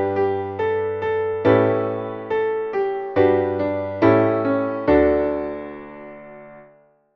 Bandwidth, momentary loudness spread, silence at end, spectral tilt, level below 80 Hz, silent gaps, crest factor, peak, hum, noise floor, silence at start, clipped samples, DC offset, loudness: 5.8 kHz; 18 LU; 0.55 s; -9.5 dB/octave; -46 dBFS; none; 18 dB; -2 dBFS; none; -54 dBFS; 0 s; under 0.1%; under 0.1%; -20 LUFS